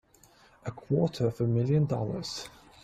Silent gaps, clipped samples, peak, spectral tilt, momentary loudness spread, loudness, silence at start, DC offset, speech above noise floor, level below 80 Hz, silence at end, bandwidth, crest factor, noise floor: none; under 0.1%; -14 dBFS; -7 dB/octave; 16 LU; -29 LUFS; 0.65 s; under 0.1%; 32 dB; -58 dBFS; 0.35 s; 13 kHz; 16 dB; -60 dBFS